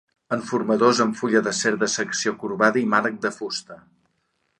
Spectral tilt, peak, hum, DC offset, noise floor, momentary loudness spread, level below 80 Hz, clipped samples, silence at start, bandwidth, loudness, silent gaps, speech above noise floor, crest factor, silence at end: -3.5 dB/octave; -4 dBFS; none; under 0.1%; -71 dBFS; 10 LU; -68 dBFS; under 0.1%; 0.3 s; 11 kHz; -22 LUFS; none; 49 dB; 20 dB; 0.85 s